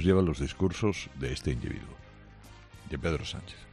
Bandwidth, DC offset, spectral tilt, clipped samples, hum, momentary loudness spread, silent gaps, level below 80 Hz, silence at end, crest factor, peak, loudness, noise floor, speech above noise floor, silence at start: 11.5 kHz; under 0.1%; -6.5 dB/octave; under 0.1%; none; 24 LU; none; -44 dBFS; 0 s; 20 dB; -12 dBFS; -32 LUFS; -51 dBFS; 21 dB; 0 s